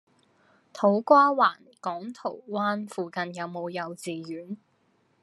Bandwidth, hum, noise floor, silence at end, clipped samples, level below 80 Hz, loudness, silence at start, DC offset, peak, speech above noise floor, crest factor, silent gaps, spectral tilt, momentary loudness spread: 12.5 kHz; none; -68 dBFS; 0.65 s; under 0.1%; -86 dBFS; -26 LUFS; 0.75 s; under 0.1%; -6 dBFS; 42 dB; 22 dB; none; -5.5 dB/octave; 18 LU